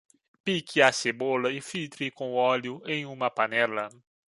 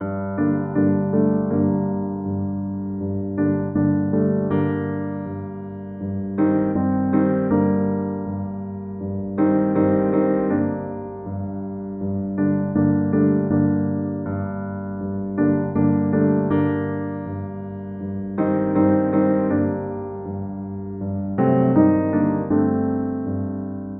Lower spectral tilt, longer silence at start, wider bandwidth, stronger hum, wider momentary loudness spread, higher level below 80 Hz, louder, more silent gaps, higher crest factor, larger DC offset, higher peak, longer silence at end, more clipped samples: second, -3.5 dB/octave vs -10.5 dB/octave; first, 0.45 s vs 0 s; first, 11.5 kHz vs 3.3 kHz; neither; about the same, 12 LU vs 11 LU; second, -74 dBFS vs -54 dBFS; second, -27 LUFS vs -22 LUFS; neither; first, 24 dB vs 18 dB; neither; about the same, -4 dBFS vs -4 dBFS; first, 0.45 s vs 0 s; neither